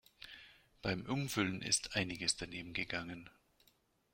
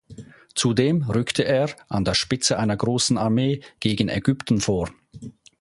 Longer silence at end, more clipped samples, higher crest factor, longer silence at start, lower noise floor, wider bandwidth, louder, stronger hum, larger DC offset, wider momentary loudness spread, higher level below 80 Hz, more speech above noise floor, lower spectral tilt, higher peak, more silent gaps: first, 0.85 s vs 0.3 s; neither; about the same, 22 dB vs 18 dB; about the same, 0.2 s vs 0.1 s; first, -74 dBFS vs -43 dBFS; first, 16.5 kHz vs 11.5 kHz; second, -38 LUFS vs -22 LUFS; neither; neither; first, 19 LU vs 9 LU; second, -64 dBFS vs -48 dBFS; first, 35 dB vs 22 dB; second, -3 dB/octave vs -4.5 dB/octave; second, -18 dBFS vs -4 dBFS; neither